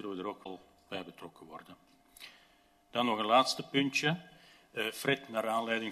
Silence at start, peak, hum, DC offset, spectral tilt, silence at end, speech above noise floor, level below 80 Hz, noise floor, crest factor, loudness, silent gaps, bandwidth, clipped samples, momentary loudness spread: 0 s; -12 dBFS; none; under 0.1%; -4 dB/octave; 0 s; 33 dB; -76 dBFS; -66 dBFS; 22 dB; -33 LUFS; none; 13.5 kHz; under 0.1%; 24 LU